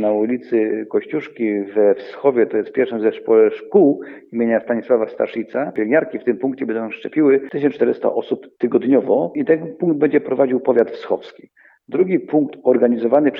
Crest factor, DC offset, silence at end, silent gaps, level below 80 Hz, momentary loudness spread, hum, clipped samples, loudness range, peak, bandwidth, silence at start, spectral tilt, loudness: 16 dB; under 0.1%; 0 s; none; -72 dBFS; 8 LU; none; under 0.1%; 2 LU; -2 dBFS; 5.2 kHz; 0 s; -9.5 dB/octave; -18 LUFS